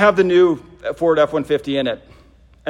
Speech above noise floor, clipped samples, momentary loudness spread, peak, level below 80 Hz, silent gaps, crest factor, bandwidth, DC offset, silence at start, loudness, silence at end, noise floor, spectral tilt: 32 dB; under 0.1%; 12 LU; 0 dBFS; -50 dBFS; none; 16 dB; 10.5 kHz; under 0.1%; 0 s; -17 LUFS; 0 s; -48 dBFS; -6.5 dB/octave